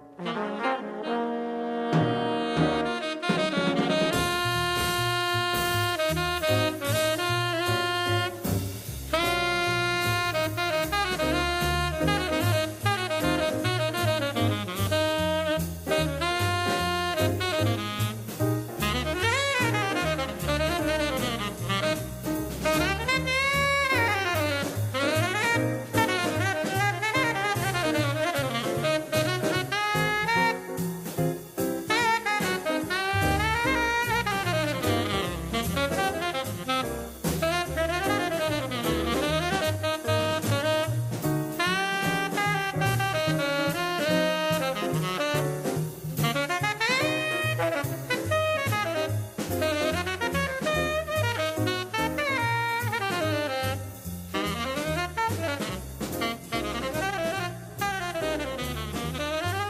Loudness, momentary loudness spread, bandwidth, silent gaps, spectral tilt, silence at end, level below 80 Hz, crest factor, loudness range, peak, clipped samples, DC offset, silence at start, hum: -26 LUFS; 6 LU; 16 kHz; none; -4.5 dB/octave; 0 s; -46 dBFS; 18 dB; 3 LU; -10 dBFS; under 0.1%; under 0.1%; 0 s; none